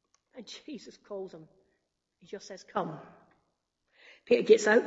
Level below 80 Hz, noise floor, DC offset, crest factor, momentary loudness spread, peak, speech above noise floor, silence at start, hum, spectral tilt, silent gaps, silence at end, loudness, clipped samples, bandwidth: -80 dBFS; -79 dBFS; under 0.1%; 24 dB; 24 LU; -8 dBFS; 50 dB; 0.35 s; none; -4 dB/octave; none; 0 s; -28 LUFS; under 0.1%; 8 kHz